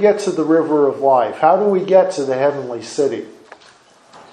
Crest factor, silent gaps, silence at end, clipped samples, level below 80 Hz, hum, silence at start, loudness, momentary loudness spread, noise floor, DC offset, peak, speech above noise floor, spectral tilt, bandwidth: 16 dB; none; 1 s; under 0.1%; -68 dBFS; none; 0 s; -16 LUFS; 11 LU; -48 dBFS; under 0.1%; 0 dBFS; 33 dB; -6 dB/octave; 10 kHz